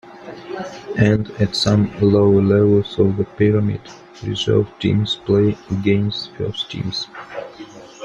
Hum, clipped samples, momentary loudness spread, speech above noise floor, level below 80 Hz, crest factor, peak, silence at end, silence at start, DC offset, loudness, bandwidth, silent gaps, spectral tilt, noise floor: none; under 0.1%; 18 LU; 20 dB; -46 dBFS; 16 dB; -2 dBFS; 0 s; 0.05 s; under 0.1%; -18 LUFS; 9.6 kHz; none; -7 dB/octave; -38 dBFS